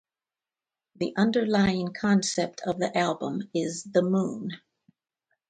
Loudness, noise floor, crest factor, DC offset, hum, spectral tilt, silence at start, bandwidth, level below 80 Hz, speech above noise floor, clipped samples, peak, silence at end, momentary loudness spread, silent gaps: -27 LUFS; under -90 dBFS; 20 dB; under 0.1%; none; -5 dB/octave; 1 s; 9.4 kHz; -60 dBFS; over 64 dB; under 0.1%; -8 dBFS; 0.9 s; 9 LU; none